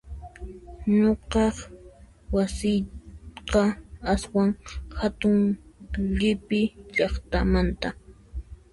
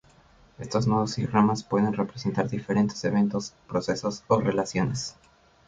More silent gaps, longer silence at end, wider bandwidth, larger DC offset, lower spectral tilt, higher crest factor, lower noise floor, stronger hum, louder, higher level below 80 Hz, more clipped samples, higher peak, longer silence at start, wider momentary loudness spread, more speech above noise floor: neither; second, 0.2 s vs 0.55 s; first, 11.5 kHz vs 7.8 kHz; neither; about the same, -6.5 dB/octave vs -6 dB/octave; about the same, 16 dB vs 20 dB; second, -50 dBFS vs -57 dBFS; neither; about the same, -25 LUFS vs -26 LUFS; first, -36 dBFS vs -56 dBFS; neither; about the same, -10 dBFS vs -8 dBFS; second, 0.05 s vs 0.6 s; first, 19 LU vs 7 LU; second, 26 dB vs 31 dB